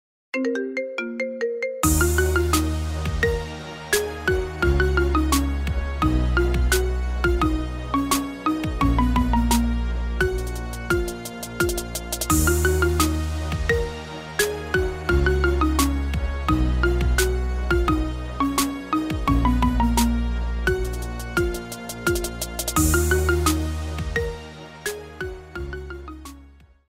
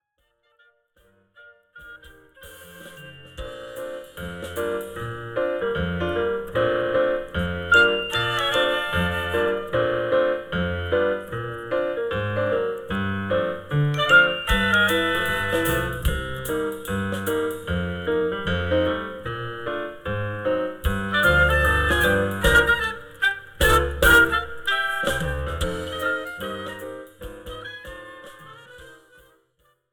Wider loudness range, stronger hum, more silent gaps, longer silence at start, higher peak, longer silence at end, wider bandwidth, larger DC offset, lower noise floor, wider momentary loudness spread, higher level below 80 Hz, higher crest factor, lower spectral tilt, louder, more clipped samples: second, 2 LU vs 14 LU; neither; neither; second, 0.35 s vs 1.4 s; about the same, -6 dBFS vs -4 dBFS; second, 0.5 s vs 0.95 s; second, 16.5 kHz vs over 20 kHz; neither; second, -49 dBFS vs -69 dBFS; second, 11 LU vs 18 LU; first, -26 dBFS vs -36 dBFS; about the same, 18 dB vs 20 dB; about the same, -5 dB/octave vs -4.5 dB/octave; about the same, -23 LUFS vs -22 LUFS; neither